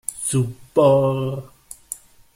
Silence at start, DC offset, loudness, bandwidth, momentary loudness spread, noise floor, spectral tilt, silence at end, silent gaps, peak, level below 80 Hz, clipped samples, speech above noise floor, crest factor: 0.1 s; under 0.1%; -19 LUFS; 16 kHz; 19 LU; -39 dBFS; -6 dB/octave; 0.4 s; none; -4 dBFS; -54 dBFS; under 0.1%; 21 dB; 18 dB